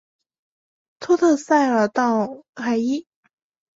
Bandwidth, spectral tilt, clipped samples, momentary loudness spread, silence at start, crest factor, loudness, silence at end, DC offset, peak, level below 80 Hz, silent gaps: 8 kHz; -5 dB/octave; under 0.1%; 12 LU; 1 s; 16 dB; -20 LUFS; 0.75 s; under 0.1%; -6 dBFS; -68 dBFS; 2.49-2.53 s